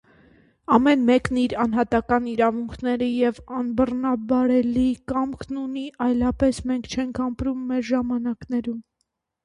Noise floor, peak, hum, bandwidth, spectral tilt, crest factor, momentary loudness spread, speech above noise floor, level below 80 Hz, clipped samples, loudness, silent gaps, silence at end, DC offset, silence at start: -76 dBFS; -4 dBFS; none; 10.5 kHz; -6 dB/octave; 18 dB; 9 LU; 54 dB; -46 dBFS; under 0.1%; -23 LUFS; none; 0.65 s; under 0.1%; 0.7 s